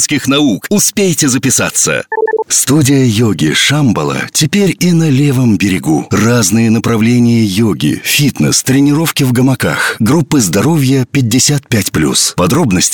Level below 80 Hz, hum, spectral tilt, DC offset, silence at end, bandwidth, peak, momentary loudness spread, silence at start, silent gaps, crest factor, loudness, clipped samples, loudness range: -42 dBFS; none; -4 dB/octave; 0.3%; 0 s; 19.5 kHz; 0 dBFS; 3 LU; 0 s; none; 10 dB; -10 LUFS; under 0.1%; 1 LU